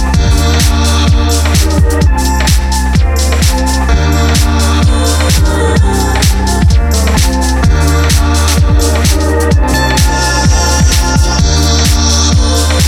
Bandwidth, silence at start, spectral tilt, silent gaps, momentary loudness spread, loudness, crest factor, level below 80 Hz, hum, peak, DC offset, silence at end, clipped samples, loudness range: 16 kHz; 0 s; -4.5 dB/octave; none; 2 LU; -10 LUFS; 8 dB; -10 dBFS; none; 0 dBFS; under 0.1%; 0 s; under 0.1%; 1 LU